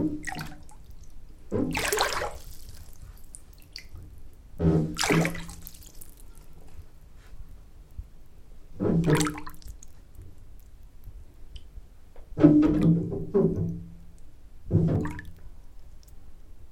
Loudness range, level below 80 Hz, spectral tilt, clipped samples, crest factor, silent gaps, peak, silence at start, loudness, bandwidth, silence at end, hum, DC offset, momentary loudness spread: 8 LU; -44 dBFS; -6 dB/octave; under 0.1%; 24 dB; none; -4 dBFS; 0 s; -26 LUFS; 17 kHz; 0 s; none; under 0.1%; 26 LU